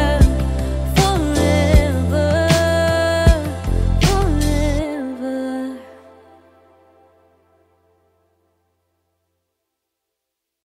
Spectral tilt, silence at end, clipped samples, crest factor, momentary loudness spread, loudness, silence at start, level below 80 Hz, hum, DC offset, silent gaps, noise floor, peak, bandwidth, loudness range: -6 dB/octave; 4.7 s; under 0.1%; 16 dB; 10 LU; -17 LUFS; 0 s; -24 dBFS; none; under 0.1%; none; -80 dBFS; -2 dBFS; 16 kHz; 15 LU